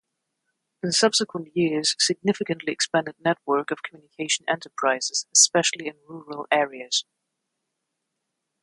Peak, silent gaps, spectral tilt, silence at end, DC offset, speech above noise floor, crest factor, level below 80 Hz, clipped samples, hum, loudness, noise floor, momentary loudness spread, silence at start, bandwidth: -4 dBFS; none; -2 dB/octave; 1.6 s; under 0.1%; 56 dB; 22 dB; -74 dBFS; under 0.1%; none; -23 LUFS; -81 dBFS; 15 LU; 0.85 s; 11.5 kHz